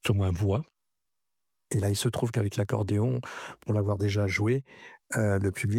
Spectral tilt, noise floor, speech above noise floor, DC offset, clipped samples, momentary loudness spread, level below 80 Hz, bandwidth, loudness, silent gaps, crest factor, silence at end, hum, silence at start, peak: -6 dB/octave; -87 dBFS; 60 dB; under 0.1%; under 0.1%; 7 LU; -56 dBFS; 15 kHz; -29 LUFS; none; 18 dB; 0 s; none; 0.05 s; -10 dBFS